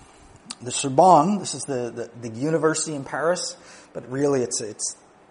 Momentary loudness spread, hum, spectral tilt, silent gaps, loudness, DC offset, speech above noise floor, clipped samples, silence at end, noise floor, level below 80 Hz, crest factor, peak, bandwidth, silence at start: 21 LU; none; -4 dB/octave; none; -22 LUFS; under 0.1%; 26 dB; under 0.1%; 0.35 s; -49 dBFS; -64 dBFS; 22 dB; -2 dBFS; 10.5 kHz; 0.5 s